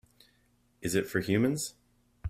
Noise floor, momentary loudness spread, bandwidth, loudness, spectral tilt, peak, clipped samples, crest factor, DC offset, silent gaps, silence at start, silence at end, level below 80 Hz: -69 dBFS; 11 LU; 16 kHz; -31 LUFS; -5 dB/octave; -12 dBFS; under 0.1%; 20 dB; under 0.1%; none; 0.8 s; 0 s; -62 dBFS